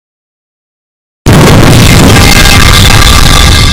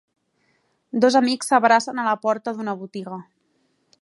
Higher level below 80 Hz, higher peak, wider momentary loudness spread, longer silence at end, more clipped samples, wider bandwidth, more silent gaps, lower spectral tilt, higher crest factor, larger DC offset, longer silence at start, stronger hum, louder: first, -8 dBFS vs -76 dBFS; about the same, 0 dBFS vs -2 dBFS; second, 2 LU vs 16 LU; second, 0 s vs 0.8 s; first, 20% vs under 0.1%; first, over 20 kHz vs 11.5 kHz; neither; about the same, -4 dB/octave vs -4 dB/octave; second, 2 dB vs 20 dB; neither; first, 1.25 s vs 0.95 s; neither; first, -2 LUFS vs -20 LUFS